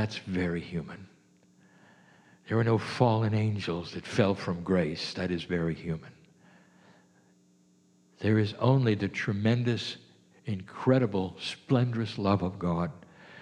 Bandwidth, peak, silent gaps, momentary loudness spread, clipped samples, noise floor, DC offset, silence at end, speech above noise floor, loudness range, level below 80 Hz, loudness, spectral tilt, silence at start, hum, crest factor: 10 kHz; -8 dBFS; none; 12 LU; under 0.1%; -64 dBFS; under 0.1%; 0 s; 35 dB; 5 LU; -60 dBFS; -29 LUFS; -7 dB/octave; 0 s; none; 22 dB